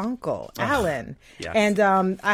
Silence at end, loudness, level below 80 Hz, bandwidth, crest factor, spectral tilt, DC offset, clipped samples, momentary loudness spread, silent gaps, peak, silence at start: 0 s; -23 LUFS; -48 dBFS; 16 kHz; 16 dB; -5.5 dB/octave; under 0.1%; under 0.1%; 13 LU; none; -8 dBFS; 0 s